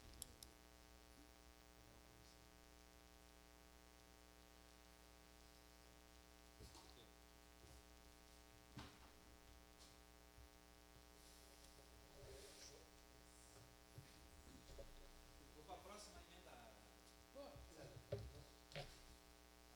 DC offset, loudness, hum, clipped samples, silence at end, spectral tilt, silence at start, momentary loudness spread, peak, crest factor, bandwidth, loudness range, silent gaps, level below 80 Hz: under 0.1%; -63 LUFS; none; under 0.1%; 0 s; -3.5 dB/octave; 0 s; 9 LU; -32 dBFS; 30 dB; over 20 kHz; 7 LU; none; -70 dBFS